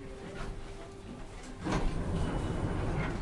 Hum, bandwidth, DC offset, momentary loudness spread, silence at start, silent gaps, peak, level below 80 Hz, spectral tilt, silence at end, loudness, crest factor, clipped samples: none; 11.5 kHz; under 0.1%; 12 LU; 0 s; none; -18 dBFS; -40 dBFS; -6.5 dB/octave; 0 s; -37 LUFS; 16 dB; under 0.1%